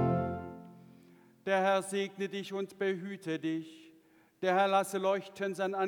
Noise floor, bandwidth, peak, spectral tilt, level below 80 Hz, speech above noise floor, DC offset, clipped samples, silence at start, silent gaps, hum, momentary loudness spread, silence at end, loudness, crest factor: -64 dBFS; 19 kHz; -14 dBFS; -5.5 dB/octave; -68 dBFS; 32 dB; under 0.1%; under 0.1%; 0 s; none; none; 14 LU; 0 s; -33 LUFS; 18 dB